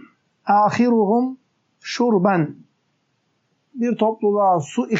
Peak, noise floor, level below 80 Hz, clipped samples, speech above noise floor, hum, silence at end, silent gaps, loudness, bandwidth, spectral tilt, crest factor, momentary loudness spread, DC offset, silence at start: -4 dBFS; -68 dBFS; -74 dBFS; under 0.1%; 50 dB; none; 0 s; none; -19 LUFS; 8 kHz; -5.5 dB/octave; 16 dB; 13 LU; under 0.1%; 0.45 s